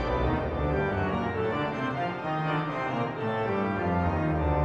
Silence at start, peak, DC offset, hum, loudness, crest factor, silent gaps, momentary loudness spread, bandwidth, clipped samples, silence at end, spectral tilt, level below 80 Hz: 0 s; -14 dBFS; under 0.1%; none; -29 LUFS; 14 dB; none; 3 LU; 7.8 kHz; under 0.1%; 0 s; -8.5 dB/octave; -38 dBFS